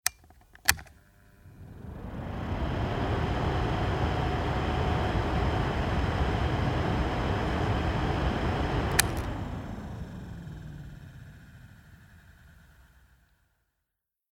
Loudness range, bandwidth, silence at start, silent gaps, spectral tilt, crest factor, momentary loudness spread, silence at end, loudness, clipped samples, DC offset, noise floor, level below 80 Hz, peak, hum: 15 LU; 19.5 kHz; 0.05 s; none; -4.5 dB/octave; 30 dB; 17 LU; 1.85 s; -30 LUFS; under 0.1%; under 0.1%; -85 dBFS; -36 dBFS; 0 dBFS; none